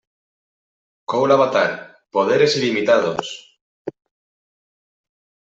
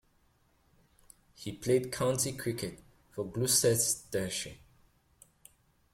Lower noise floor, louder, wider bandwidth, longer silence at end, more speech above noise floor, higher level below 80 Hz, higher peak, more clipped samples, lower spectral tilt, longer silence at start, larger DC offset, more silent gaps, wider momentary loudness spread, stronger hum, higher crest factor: first, under -90 dBFS vs -69 dBFS; first, -18 LUFS vs -31 LUFS; second, 8 kHz vs 16.5 kHz; first, 1.65 s vs 1.35 s; first, over 73 dB vs 38 dB; about the same, -66 dBFS vs -62 dBFS; first, -4 dBFS vs -14 dBFS; neither; about the same, -4.5 dB/octave vs -3.5 dB/octave; second, 1.1 s vs 1.4 s; neither; first, 3.61-3.85 s vs none; about the same, 20 LU vs 18 LU; neither; about the same, 18 dB vs 22 dB